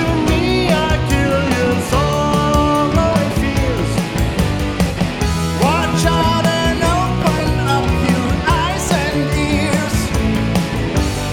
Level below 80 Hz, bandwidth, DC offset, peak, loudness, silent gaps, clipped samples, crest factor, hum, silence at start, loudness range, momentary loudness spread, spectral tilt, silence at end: -24 dBFS; 18.5 kHz; under 0.1%; 0 dBFS; -16 LUFS; none; under 0.1%; 16 dB; none; 0 s; 2 LU; 4 LU; -5.5 dB/octave; 0 s